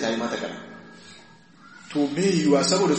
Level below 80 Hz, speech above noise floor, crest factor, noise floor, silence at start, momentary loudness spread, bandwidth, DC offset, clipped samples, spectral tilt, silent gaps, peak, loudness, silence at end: -68 dBFS; 28 dB; 18 dB; -51 dBFS; 0 s; 24 LU; 8.8 kHz; under 0.1%; under 0.1%; -4.5 dB/octave; none; -8 dBFS; -23 LUFS; 0 s